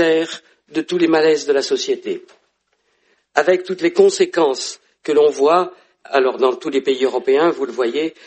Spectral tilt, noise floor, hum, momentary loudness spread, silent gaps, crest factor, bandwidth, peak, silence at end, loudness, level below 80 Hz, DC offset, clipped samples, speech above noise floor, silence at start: -3.5 dB/octave; -66 dBFS; none; 12 LU; none; 18 dB; 8.8 kHz; 0 dBFS; 0.15 s; -17 LUFS; -68 dBFS; under 0.1%; under 0.1%; 49 dB; 0 s